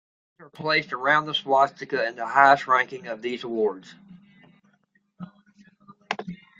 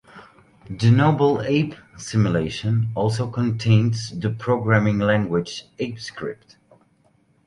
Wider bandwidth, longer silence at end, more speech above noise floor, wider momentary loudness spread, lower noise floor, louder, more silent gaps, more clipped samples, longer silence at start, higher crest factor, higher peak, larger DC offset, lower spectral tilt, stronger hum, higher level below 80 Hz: second, 7.8 kHz vs 10.5 kHz; second, 0.25 s vs 1.15 s; first, 44 dB vs 40 dB; first, 23 LU vs 14 LU; first, -67 dBFS vs -61 dBFS; about the same, -23 LUFS vs -21 LUFS; neither; neither; first, 0.4 s vs 0.15 s; first, 24 dB vs 18 dB; about the same, -2 dBFS vs -2 dBFS; neither; second, -4.5 dB/octave vs -7 dB/octave; neither; second, -72 dBFS vs -50 dBFS